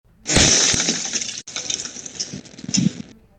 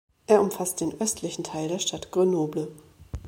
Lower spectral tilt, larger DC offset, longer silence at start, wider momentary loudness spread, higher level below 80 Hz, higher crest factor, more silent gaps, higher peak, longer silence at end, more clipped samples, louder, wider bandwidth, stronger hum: second, -2 dB/octave vs -4.5 dB/octave; neither; about the same, 0.25 s vs 0.3 s; first, 16 LU vs 11 LU; first, -40 dBFS vs -50 dBFS; about the same, 18 dB vs 22 dB; neither; about the same, -4 dBFS vs -6 dBFS; first, 0.3 s vs 0 s; neither; first, -18 LUFS vs -26 LUFS; about the same, 18 kHz vs 16.5 kHz; neither